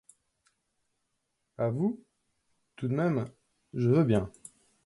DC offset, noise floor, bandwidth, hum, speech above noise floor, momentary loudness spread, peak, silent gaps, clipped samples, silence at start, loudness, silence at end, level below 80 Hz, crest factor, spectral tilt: under 0.1%; -80 dBFS; 11.5 kHz; none; 53 dB; 17 LU; -12 dBFS; none; under 0.1%; 1.6 s; -29 LUFS; 0.55 s; -60 dBFS; 20 dB; -8.5 dB/octave